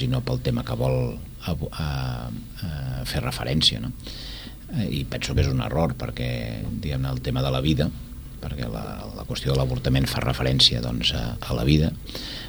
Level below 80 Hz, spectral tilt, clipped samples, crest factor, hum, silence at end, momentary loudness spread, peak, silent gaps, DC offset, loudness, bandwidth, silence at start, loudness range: -34 dBFS; -5.5 dB/octave; under 0.1%; 22 dB; none; 0 s; 14 LU; -4 dBFS; none; under 0.1%; -25 LUFS; over 20 kHz; 0 s; 5 LU